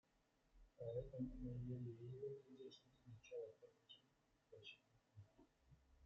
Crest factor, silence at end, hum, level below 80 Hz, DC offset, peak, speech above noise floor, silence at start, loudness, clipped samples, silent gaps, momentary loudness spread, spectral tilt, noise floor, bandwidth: 18 dB; 0 s; none; -70 dBFS; under 0.1%; -38 dBFS; 28 dB; 0.55 s; -54 LUFS; under 0.1%; none; 18 LU; -7.5 dB/octave; -82 dBFS; 7.4 kHz